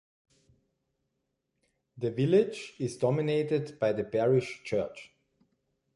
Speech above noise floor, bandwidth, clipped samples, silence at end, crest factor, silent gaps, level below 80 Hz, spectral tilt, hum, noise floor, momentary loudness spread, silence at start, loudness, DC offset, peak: 53 dB; 11.5 kHz; under 0.1%; 0.9 s; 18 dB; none; -68 dBFS; -7 dB/octave; none; -81 dBFS; 11 LU; 1.95 s; -29 LUFS; under 0.1%; -12 dBFS